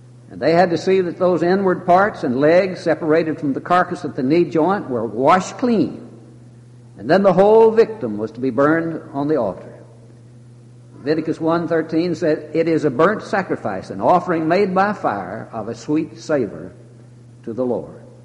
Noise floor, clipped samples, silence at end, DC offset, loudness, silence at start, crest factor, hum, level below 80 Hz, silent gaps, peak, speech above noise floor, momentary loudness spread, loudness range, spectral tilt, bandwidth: -43 dBFS; under 0.1%; 0.2 s; under 0.1%; -18 LUFS; 0.3 s; 16 dB; none; -58 dBFS; none; -2 dBFS; 25 dB; 12 LU; 6 LU; -7 dB/octave; 10.5 kHz